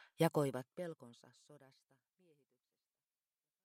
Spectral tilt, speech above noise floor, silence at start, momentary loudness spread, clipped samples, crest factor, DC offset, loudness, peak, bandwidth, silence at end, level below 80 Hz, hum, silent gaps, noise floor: -6.5 dB/octave; over 49 dB; 0.2 s; 21 LU; under 0.1%; 24 dB; under 0.1%; -39 LUFS; -20 dBFS; 16 kHz; 2.1 s; -88 dBFS; none; none; under -90 dBFS